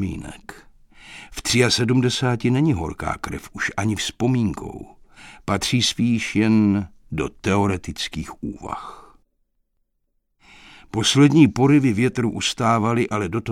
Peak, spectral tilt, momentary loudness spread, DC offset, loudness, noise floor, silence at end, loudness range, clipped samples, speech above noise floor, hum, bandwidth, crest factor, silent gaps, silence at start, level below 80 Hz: -2 dBFS; -5 dB/octave; 17 LU; under 0.1%; -20 LUFS; -71 dBFS; 0 s; 9 LU; under 0.1%; 51 dB; none; 15.5 kHz; 20 dB; none; 0 s; -46 dBFS